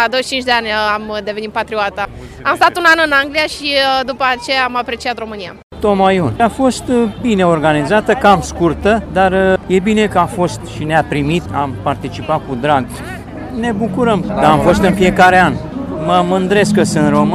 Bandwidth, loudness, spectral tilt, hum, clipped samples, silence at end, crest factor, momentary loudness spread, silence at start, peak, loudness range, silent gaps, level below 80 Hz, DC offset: 15 kHz; -13 LUFS; -5 dB/octave; none; under 0.1%; 0 s; 14 dB; 10 LU; 0 s; 0 dBFS; 4 LU; 5.63-5.70 s; -36 dBFS; under 0.1%